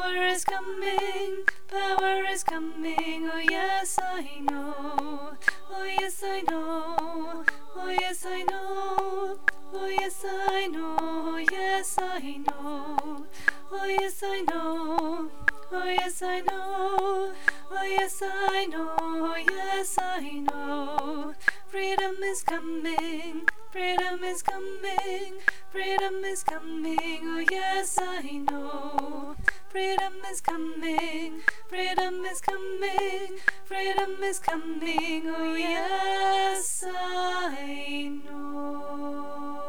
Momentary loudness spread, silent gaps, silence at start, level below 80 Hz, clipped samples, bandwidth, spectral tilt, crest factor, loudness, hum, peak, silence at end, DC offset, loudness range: 7 LU; none; 0 s; -60 dBFS; under 0.1%; over 20 kHz; -2 dB/octave; 20 dB; -29 LUFS; none; -8 dBFS; 0 s; 2%; 2 LU